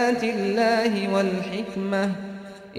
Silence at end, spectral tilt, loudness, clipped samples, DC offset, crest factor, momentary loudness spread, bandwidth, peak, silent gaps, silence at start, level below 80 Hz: 0 s; -5.5 dB/octave; -24 LUFS; under 0.1%; under 0.1%; 14 dB; 11 LU; 14.5 kHz; -10 dBFS; none; 0 s; -62 dBFS